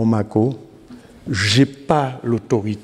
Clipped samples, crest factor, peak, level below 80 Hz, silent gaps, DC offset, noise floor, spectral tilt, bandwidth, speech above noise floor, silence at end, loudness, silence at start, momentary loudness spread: under 0.1%; 18 dB; -2 dBFS; -52 dBFS; none; under 0.1%; -42 dBFS; -5.5 dB/octave; 13 kHz; 24 dB; 0 s; -19 LUFS; 0 s; 10 LU